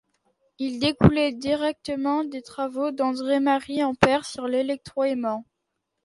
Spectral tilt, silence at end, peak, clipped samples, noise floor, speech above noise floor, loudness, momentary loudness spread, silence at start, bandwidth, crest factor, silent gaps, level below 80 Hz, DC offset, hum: -6.5 dB/octave; 0.6 s; 0 dBFS; under 0.1%; -79 dBFS; 56 dB; -24 LUFS; 11 LU; 0.6 s; 11.5 kHz; 24 dB; none; -46 dBFS; under 0.1%; none